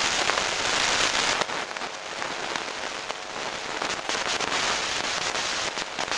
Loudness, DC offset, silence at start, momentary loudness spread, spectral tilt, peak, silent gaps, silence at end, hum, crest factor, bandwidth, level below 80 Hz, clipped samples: -26 LUFS; under 0.1%; 0 s; 10 LU; -0.5 dB/octave; -2 dBFS; none; 0 s; none; 26 dB; 11 kHz; -56 dBFS; under 0.1%